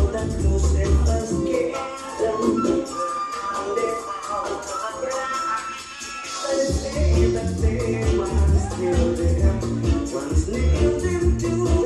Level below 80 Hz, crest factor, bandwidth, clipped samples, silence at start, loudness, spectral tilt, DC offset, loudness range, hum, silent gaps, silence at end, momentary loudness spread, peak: -26 dBFS; 14 dB; 12 kHz; under 0.1%; 0 s; -23 LUFS; -6 dB/octave; under 0.1%; 5 LU; none; none; 0 s; 7 LU; -8 dBFS